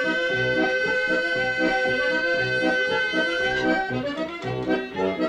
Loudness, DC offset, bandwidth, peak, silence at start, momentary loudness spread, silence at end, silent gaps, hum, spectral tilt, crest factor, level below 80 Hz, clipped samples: -23 LUFS; under 0.1%; 10.5 kHz; -10 dBFS; 0 s; 5 LU; 0 s; none; none; -5 dB/octave; 12 dB; -52 dBFS; under 0.1%